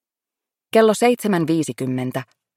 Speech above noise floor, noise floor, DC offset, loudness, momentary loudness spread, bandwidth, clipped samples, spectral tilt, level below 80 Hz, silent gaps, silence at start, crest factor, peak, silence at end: 69 dB; -88 dBFS; under 0.1%; -19 LUFS; 10 LU; 17 kHz; under 0.1%; -5.5 dB/octave; -68 dBFS; none; 0.75 s; 16 dB; -4 dBFS; 0.35 s